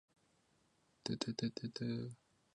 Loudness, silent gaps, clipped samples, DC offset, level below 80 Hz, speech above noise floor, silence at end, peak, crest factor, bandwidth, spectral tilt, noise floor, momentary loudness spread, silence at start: -43 LUFS; none; under 0.1%; under 0.1%; -76 dBFS; 34 dB; 0.4 s; -22 dBFS; 22 dB; 10.5 kHz; -5.5 dB/octave; -76 dBFS; 9 LU; 1.05 s